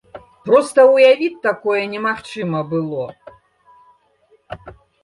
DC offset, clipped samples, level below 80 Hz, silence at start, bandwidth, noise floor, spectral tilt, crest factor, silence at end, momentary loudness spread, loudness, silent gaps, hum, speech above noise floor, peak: under 0.1%; under 0.1%; -58 dBFS; 0.15 s; 11.5 kHz; -57 dBFS; -5.5 dB/octave; 16 dB; 0.3 s; 24 LU; -16 LUFS; none; none; 41 dB; -2 dBFS